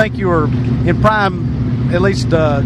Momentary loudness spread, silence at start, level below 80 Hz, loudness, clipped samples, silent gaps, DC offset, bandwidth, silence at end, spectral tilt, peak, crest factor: 4 LU; 0 s; -28 dBFS; -14 LUFS; under 0.1%; none; under 0.1%; 9.8 kHz; 0 s; -7.5 dB/octave; 0 dBFS; 14 dB